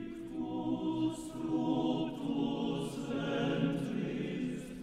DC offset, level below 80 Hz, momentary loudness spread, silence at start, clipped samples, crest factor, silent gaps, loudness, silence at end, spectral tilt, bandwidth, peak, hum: under 0.1%; -60 dBFS; 6 LU; 0 s; under 0.1%; 16 dB; none; -36 LUFS; 0 s; -6.5 dB/octave; 13 kHz; -20 dBFS; none